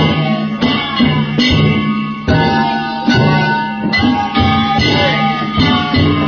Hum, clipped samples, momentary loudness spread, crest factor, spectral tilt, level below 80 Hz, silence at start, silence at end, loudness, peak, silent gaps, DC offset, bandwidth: none; under 0.1%; 4 LU; 12 dB; -6.5 dB/octave; -30 dBFS; 0 s; 0 s; -13 LUFS; 0 dBFS; none; under 0.1%; 6.8 kHz